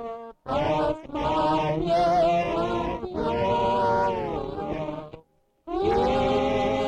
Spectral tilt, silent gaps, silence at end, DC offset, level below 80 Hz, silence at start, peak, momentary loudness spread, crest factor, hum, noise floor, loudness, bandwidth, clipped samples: -6.5 dB/octave; none; 0 s; under 0.1%; -44 dBFS; 0 s; -14 dBFS; 10 LU; 12 dB; none; -57 dBFS; -25 LUFS; 10.5 kHz; under 0.1%